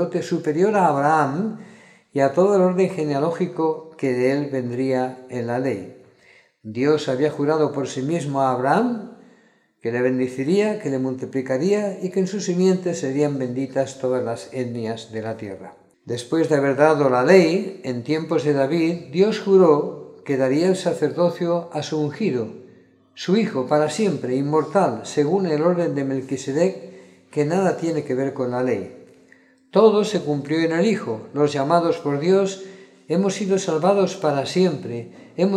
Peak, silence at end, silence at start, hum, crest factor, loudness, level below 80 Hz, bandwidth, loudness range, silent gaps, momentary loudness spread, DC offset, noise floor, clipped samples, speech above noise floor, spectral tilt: 0 dBFS; 0 s; 0 s; none; 20 dB; -21 LUFS; -72 dBFS; 11.5 kHz; 5 LU; none; 12 LU; under 0.1%; -57 dBFS; under 0.1%; 37 dB; -6.5 dB/octave